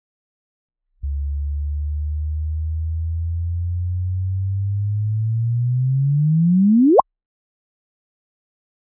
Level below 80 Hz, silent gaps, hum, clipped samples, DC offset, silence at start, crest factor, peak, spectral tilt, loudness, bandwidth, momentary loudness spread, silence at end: -28 dBFS; none; none; under 0.1%; under 0.1%; 1 s; 20 dB; -2 dBFS; -18 dB/octave; -21 LUFS; 1.2 kHz; 11 LU; 2 s